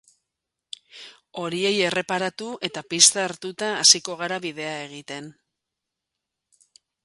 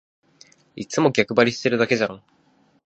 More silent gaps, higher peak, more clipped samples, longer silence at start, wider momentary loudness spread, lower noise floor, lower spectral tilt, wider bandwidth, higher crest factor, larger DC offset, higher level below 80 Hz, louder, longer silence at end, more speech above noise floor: neither; about the same, 0 dBFS vs -2 dBFS; neither; first, 0.95 s vs 0.75 s; first, 23 LU vs 9 LU; first, -84 dBFS vs -60 dBFS; second, -1 dB/octave vs -5 dB/octave; first, 11.5 kHz vs 8.4 kHz; about the same, 26 dB vs 22 dB; neither; second, -72 dBFS vs -64 dBFS; about the same, -21 LUFS vs -20 LUFS; first, 1.75 s vs 0.7 s; first, 61 dB vs 40 dB